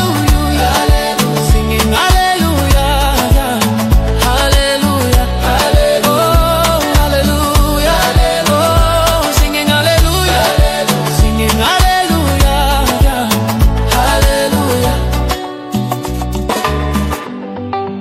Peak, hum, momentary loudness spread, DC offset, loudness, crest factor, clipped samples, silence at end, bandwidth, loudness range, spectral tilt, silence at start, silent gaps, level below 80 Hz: 0 dBFS; none; 6 LU; under 0.1%; -12 LUFS; 12 dB; under 0.1%; 0 s; 16.5 kHz; 3 LU; -4.5 dB/octave; 0 s; none; -16 dBFS